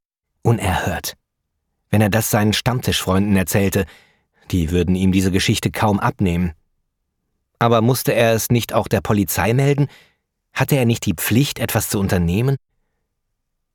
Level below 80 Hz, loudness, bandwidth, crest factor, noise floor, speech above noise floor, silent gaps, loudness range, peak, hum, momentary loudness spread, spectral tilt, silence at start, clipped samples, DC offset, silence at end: -40 dBFS; -18 LUFS; 19 kHz; 16 dB; -74 dBFS; 57 dB; none; 2 LU; -2 dBFS; none; 7 LU; -5.5 dB/octave; 0.45 s; under 0.1%; under 0.1%; 1.2 s